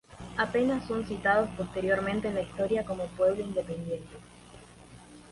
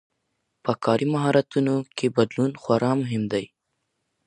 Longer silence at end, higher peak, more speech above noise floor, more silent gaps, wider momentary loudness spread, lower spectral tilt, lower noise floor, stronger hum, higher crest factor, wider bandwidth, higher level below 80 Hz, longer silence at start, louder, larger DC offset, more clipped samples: second, 0 s vs 0.8 s; second, -12 dBFS vs -4 dBFS; second, 22 dB vs 54 dB; neither; first, 11 LU vs 7 LU; about the same, -6 dB/octave vs -7 dB/octave; second, -51 dBFS vs -77 dBFS; first, 60 Hz at -45 dBFS vs none; about the same, 18 dB vs 20 dB; about the same, 11.5 kHz vs 10.5 kHz; first, -54 dBFS vs -66 dBFS; second, 0.1 s vs 0.65 s; second, -30 LUFS vs -24 LUFS; neither; neither